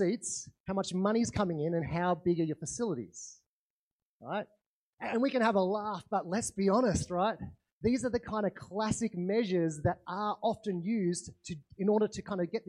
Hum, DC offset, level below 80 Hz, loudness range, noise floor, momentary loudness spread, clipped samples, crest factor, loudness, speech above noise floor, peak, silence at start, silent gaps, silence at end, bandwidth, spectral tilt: none; under 0.1%; -60 dBFS; 4 LU; under -90 dBFS; 11 LU; under 0.1%; 18 dB; -33 LUFS; over 58 dB; -16 dBFS; 0 s; 0.60-0.64 s, 3.46-4.20 s, 4.66-4.93 s, 7.72-7.81 s; 0.1 s; 12 kHz; -5.5 dB/octave